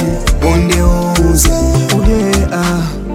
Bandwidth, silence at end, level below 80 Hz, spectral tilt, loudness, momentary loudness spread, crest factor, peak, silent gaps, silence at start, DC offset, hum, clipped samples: 16.5 kHz; 0 s; -16 dBFS; -5 dB/octave; -12 LUFS; 4 LU; 10 dB; 0 dBFS; none; 0 s; under 0.1%; none; under 0.1%